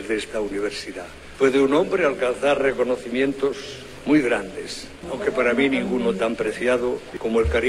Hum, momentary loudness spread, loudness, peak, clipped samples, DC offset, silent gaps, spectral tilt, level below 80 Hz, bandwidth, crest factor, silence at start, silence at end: none; 13 LU; -22 LUFS; -6 dBFS; under 0.1%; under 0.1%; none; -5 dB/octave; -42 dBFS; 13.5 kHz; 16 dB; 0 s; 0 s